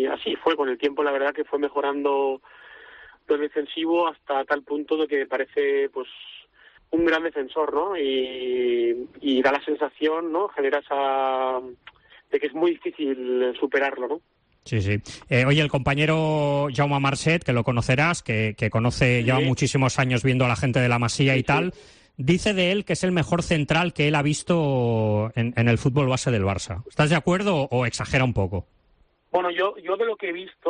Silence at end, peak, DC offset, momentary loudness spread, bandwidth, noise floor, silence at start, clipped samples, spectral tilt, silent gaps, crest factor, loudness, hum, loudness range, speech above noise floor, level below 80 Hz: 0 s; -8 dBFS; under 0.1%; 7 LU; 10 kHz; -62 dBFS; 0 s; under 0.1%; -6 dB/octave; none; 14 dB; -23 LUFS; none; 4 LU; 39 dB; -50 dBFS